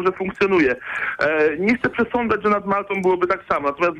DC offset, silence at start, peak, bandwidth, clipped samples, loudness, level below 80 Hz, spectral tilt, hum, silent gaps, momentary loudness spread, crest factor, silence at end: under 0.1%; 0 s; -8 dBFS; 8.8 kHz; under 0.1%; -20 LUFS; -52 dBFS; -7 dB/octave; none; none; 4 LU; 12 dB; 0 s